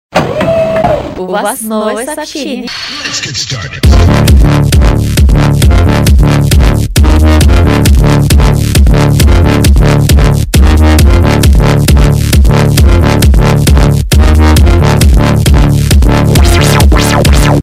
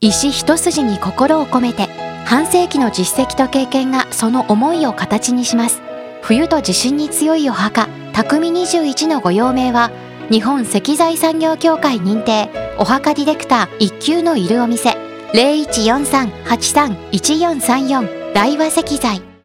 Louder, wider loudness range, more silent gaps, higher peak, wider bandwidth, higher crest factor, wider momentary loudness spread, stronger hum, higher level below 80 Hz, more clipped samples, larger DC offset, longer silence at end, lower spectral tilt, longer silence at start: first, -7 LUFS vs -15 LUFS; first, 4 LU vs 1 LU; neither; about the same, 0 dBFS vs 0 dBFS; about the same, 16 kHz vs 16.5 kHz; second, 6 dB vs 14 dB; first, 8 LU vs 4 LU; neither; first, -8 dBFS vs -44 dBFS; first, 0.5% vs under 0.1%; neither; second, 0 s vs 0.15 s; first, -5.5 dB/octave vs -3.5 dB/octave; first, 0.15 s vs 0 s